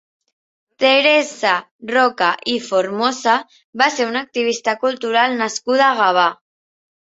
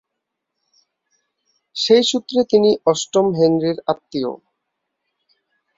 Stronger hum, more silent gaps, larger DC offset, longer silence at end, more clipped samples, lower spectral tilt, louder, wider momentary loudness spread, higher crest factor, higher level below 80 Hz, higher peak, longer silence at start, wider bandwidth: neither; first, 1.71-1.79 s, 3.64-3.73 s vs none; neither; second, 0.65 s vs 1.4 s; neither; second, -2 dB/octave vs -4.5 dB/octave; about the same, -17 LUFS vs -17 LUFS; second, 7 LU vs 11 LU; about the same, 18 dB vs 18 dB; about the same, -68 dBFS vs -64 dBFS; about the same, 0 dBFS vs -2 dBFS; second, 0.8 s vs 1.75 s; about the same, 8 kHz vs 7.8 kHz